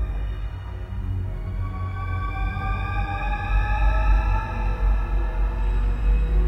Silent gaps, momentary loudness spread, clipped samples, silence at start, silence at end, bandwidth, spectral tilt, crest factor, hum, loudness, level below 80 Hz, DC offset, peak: none; 8 LU; under 0.1%; 0 s; 0 s; 5.6 kHz; -7.5 dB/octave; 12 dB; none; -26 LUFS; -24 dBFS; under 0.1%; -10 dBFS